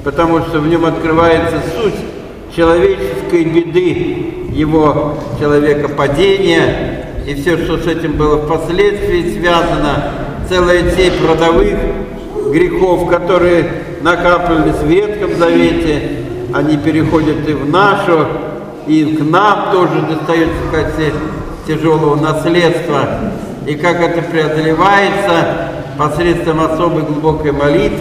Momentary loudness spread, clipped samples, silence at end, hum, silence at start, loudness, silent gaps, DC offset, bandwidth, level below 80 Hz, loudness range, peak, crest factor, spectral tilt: 9 LU; under 0.1%; 0 s; none; 0 s; -12 LUFS; none; under 0.1%; 14 kHz; -28 dBFS; 2 LU; 0 dBFS; 12 dB; -6.5 dB/octave